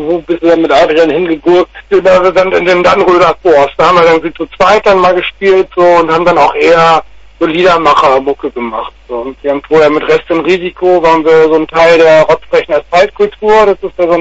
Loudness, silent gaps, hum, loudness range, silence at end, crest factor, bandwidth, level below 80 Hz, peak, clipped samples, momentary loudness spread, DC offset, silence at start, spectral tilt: -8 LUFS; none; none; 3 LU; 0 s; 8 dB; 8 kHz; -38 dBFS; 0 dBFS; 0.3%; 8 LU; under 0.1%; 0 s; -5.5 dB/octave